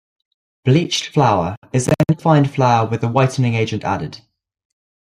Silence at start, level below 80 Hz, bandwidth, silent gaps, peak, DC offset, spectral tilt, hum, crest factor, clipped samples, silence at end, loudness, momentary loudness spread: 0.65 s; -52 dBFS; 13 kHz; 1.57-1.62 s; -2 dBFS; under 0.1%; -6 dB/octave; none; 16 dB; under 0.1%; 0.85 s; -17 LUFS; 8 LU